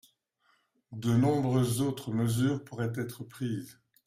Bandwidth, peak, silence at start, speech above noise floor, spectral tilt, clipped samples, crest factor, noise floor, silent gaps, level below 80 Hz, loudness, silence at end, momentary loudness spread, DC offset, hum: 16 kHz; -14 dBFS; 0.9 s; 43 dB; -6.5 dB/octave; under 0.1%; 16 dB; -72 dBFS; none; -62 dBFS; -30 LUFS; 0.35 s; 13 LU; under 0.1%; none